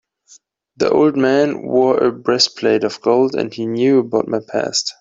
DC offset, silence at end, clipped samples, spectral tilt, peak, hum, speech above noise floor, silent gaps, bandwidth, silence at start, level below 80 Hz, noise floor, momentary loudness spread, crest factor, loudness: under 0.1%; 0.1 s; under 0.1%; -4 dB/octave; -2 dBFS; none; 34 dB; none; 8 kHz; 0.8 s; -60 dBFS; -50 dBFS; 6 LU; 16 dB; -16 LUFS